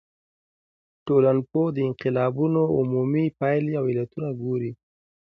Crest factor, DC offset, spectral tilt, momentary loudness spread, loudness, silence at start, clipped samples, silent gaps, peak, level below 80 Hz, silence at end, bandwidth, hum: 16 dB; under 0.1%; -11 dB/octave; 9 LU; -24 LUFS; 1.05 s; under 0.1%; none; -8 dBFS; -62 dBFS; 0.45 s; 5.4 kHz; none